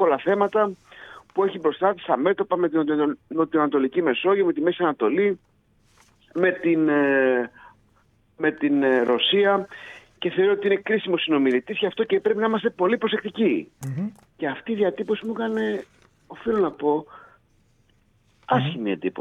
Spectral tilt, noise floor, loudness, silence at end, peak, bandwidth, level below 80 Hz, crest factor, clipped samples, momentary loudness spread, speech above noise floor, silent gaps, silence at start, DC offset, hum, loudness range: -7 dB/octave; -62 dBFS; -23 LUFS; 0 s; -4 dBFS; 8 kHz; -64 dBFS; 18 dB; under 0.1%; 11 LU; 40 dB; none; 0 s; under 0.1%; none; 5 LU